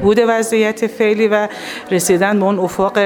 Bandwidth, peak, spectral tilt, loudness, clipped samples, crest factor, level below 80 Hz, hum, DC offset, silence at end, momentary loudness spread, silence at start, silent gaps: 19 kHz; -2 dBFS; -4.5 dB/octave; -15 LUFS; under 0.1%; 12 dB; -48 dBFS; none; under 0.1%; 0 s; 5 LU; 0 s; none